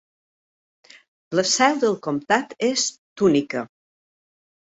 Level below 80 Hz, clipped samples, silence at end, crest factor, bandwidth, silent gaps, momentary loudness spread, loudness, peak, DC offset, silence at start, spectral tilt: -64 dBFS; under 0.1%; 1.1 s; 20 dB; 8.4 kHz; 2.98-3.16 s; 10 LU; -21 LUFS; -4 dBFS; under 0.1%; 1.3 s; -3 dB/octave